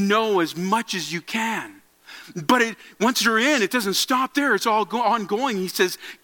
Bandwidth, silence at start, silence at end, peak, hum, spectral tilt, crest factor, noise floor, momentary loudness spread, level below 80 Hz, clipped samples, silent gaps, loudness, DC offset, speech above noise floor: 17.5 kHz; 0 s; 0.1 s; -4 dBFS; none; -3 dB/octave; 18 dB; -45 dBFS; 8 LU; -72 dBFS; under 0.1%; none; -21 LUFS; under 0.1%; 23 dB